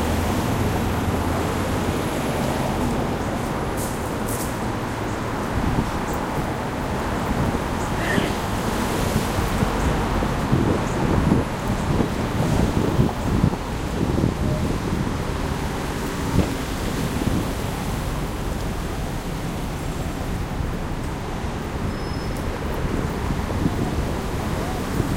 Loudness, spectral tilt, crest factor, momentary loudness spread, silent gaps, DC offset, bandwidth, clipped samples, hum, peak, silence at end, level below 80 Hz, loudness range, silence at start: -24 LUFS; -6 dB/octave; 18 dB; 6 LU; none; under 0.1%; 16 kHz; under 0.1%; none; -4 dBFS; 0 s; -30 dBFS; 6 LU; 0 s